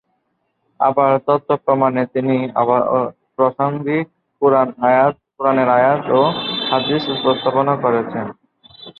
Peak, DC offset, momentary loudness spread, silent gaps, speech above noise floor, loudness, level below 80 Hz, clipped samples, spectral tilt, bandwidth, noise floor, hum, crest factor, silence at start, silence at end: -2 dBFS; under 0.1%; 6 LU; none; 53 dB; -17 LUFS; -62 dBFS; under 0.1%; -9 dB/octave; 5.6 kHz; -69 dBFS; none; 16 dB; 0.8 s; 0.1 s